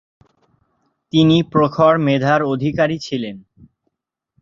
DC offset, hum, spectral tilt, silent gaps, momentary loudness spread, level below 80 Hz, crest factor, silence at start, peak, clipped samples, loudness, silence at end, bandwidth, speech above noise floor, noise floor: under 0.1%; none; -7 dB/octave; none; 11 LU; -52 dBFS; 16 dB; 1.15 s; -2 dBFS; under 0.1%; -16 LUFS; 1 s; 7.4 kHz; 62 dB; -77 dBFS